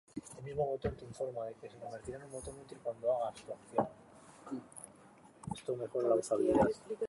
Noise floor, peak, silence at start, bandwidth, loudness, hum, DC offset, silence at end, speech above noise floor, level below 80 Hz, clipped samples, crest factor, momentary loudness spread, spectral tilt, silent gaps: -60 dBFS; -16 dBFS; 0.15 s; 11.5 kHz; -37 LUFS; none; under 0.1%; 0 s; 24 dB; -60 dBFS; under 0.1%; 20 dB; 19 LU; -6.5 dB/octave; none